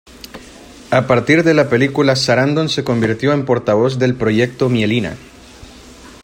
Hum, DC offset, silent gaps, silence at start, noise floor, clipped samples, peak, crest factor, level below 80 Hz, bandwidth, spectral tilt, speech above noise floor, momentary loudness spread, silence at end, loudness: none; under 0.1%; none; 0.35 s; -39 dBFS; under 0.1%; 0 dBFS; 14 dB; -46 dBFS; 16 kHz; -6 dB/octave; 24 dB; 15 LU; 0.1 s; -15 LUFS